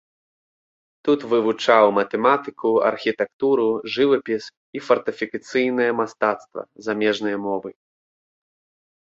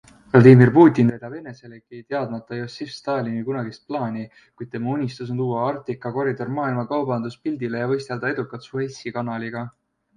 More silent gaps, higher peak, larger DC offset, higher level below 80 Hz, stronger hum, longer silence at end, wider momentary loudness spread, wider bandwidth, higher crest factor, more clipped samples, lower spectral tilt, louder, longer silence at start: first, 3.33-3.39 s, 4.57-4.73 s vs none; about the same, -2 dBFS vs 0 dBFS; neither; second, -68 dBFS vs -60 dBFS; neither; first, 1.35 s vs 0.45 s; second, 11 LU vs 20 LU; second, 7.8 kHz vs 9.8 kHz; about the same, 20 dB vs 20 dB; neither; second, -5 dB/octave vs -8.5 dB/octave; about the same, -21 LUFS vs -21 LUFS; first, 1.05 s vs 0.35 s